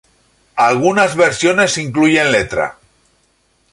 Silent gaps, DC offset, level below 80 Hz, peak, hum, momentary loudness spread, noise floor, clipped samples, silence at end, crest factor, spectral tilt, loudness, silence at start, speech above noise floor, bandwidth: none; under 0.1%; -48 dBFS; -2 dBFS; none; 8 LU; -59 dBFS; under 0.1%; 1 s; 14 dB; -4 dB/octave; -13 LUFS; 0.55 s; 46 dB; 11.5 kHz